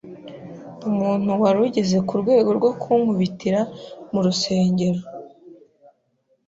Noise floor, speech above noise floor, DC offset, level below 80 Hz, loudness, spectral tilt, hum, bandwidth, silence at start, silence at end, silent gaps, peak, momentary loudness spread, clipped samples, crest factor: -67 dBFS; 47 dB; under 0.1%; -60 dBFS; -20 LUFS; -6.5 dB/octave; none; 7.8 kHz; 0.05 s; 0.95 s; none; -6 dBFS; 20 LU; under 0.1%; 16 dB